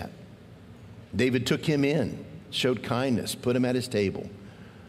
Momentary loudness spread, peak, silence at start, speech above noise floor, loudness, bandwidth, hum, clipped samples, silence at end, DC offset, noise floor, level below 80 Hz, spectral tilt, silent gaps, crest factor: 22 LU; -10 dBFS; 0 s; 22 dB; -27 LUFS; 16 kHz; none; under 0.1%; 0 s; under 0.1%; -48 dBFS; -60 dBFS; -5.5 dB/octave; none; 18 dB